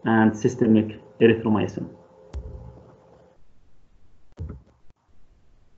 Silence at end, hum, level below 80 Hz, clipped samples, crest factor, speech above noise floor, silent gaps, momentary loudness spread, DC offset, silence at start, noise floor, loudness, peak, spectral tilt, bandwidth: 0.55 s; none; -48 dBFS; under 0.1%; 22 dB; 33 dB; none; 22 LU; under 0.1%; 0.05 s; -54 dBFS; -21 LUFS; -4 dBFS; -7.5 dB/octave; 7.6 kHz